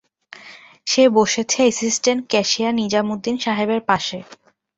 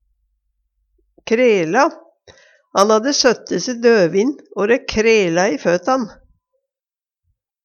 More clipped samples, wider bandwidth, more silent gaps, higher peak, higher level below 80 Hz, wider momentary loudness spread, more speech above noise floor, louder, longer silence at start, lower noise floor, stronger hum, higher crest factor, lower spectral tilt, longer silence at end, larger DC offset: neither; second, 8.2 kHz vs 10.5 kHz; neither; about the same, -2 dBFS vs 0 dBFS; second, -60 dBFS vs -50 dBFS; first, 13 LU vs 8 LU; second, 25 dB vs over 75 dB; about the same, -18 LUFS vs -16 LUFS; second, 0.4 s vs 1.25 s; second, -43 dBFS vs under -90 dBFS; neither; about the same, 18 dB vs 18 dB; about the same, -3 dB/octave vs -4 dB/octave; second, 0.45 s vs 1.55 s; neither